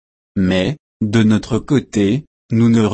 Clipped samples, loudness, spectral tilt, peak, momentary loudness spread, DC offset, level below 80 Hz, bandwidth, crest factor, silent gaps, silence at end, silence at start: under 0.1%; -17 LUFS; -7 dB/octave; -2 dBFS; 9 LU; under 0.1%; -44 dBFS; 8.8 kHz; 14 dB; 0.80-1.00 s, 2.27-2.49 s; 0 s; 0.35 s